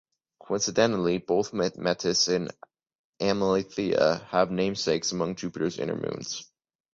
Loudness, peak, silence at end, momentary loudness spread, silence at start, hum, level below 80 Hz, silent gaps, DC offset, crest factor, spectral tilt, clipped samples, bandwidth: -27 LUFS; -8 dBFS; 0.5 s; 9 LU; 0.45 s; none; -60 dBFS; 2.95-3.13 s; under 0.1%; 20 dB; -4 dB/octave; under 0.1%; 7.8 kHz